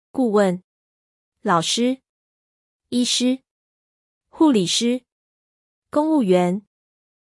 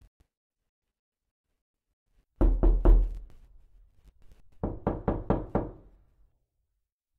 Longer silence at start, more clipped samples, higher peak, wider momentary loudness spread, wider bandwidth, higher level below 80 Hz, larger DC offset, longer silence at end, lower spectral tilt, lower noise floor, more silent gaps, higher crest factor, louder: second, 0.15 s vs 2.4 s; neither; about the same, -6 dBFS vs -8 dBFS; about the same, 12 LU vs 13 LU; first, 12 kHz vs 2.4 kHz; second, -70 dBFS vs -30 dBFS; neither; second, 0.75 s vs 1.45 s; second, -4.5 dB/octave vs -11 dB/octave; first, under -90 dBFS vs -82 dBFS; first, 0.64-1.32 s, 2.09-2.80 s, 3.51-4.21 s, 5.12-5.82 s vs none; second, 16 dB vs 22 dB; first, -20 LUFS vs -29 LUFS